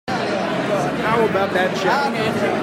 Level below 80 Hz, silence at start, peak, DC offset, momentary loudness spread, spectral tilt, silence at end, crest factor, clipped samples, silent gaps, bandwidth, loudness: -54 dBFS; 0.05 s; -4 dBFS; under 0.1%; 4 LU; -5.5 dB/octave; 0 s; 14 dB; under 0.1%; none; 16 kHz; -19 LUFS